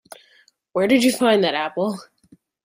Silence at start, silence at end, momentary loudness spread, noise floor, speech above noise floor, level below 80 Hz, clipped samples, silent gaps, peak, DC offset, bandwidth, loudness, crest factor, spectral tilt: 0.75 s; 0.6 s; 11 LU; -58 dBFS; 39 dB; -66 dBFS; under 0.1%; none; -4 dBFS; under 0.1%; 16 kHz; -19 LUFS; 18 dB; -4 dB/octave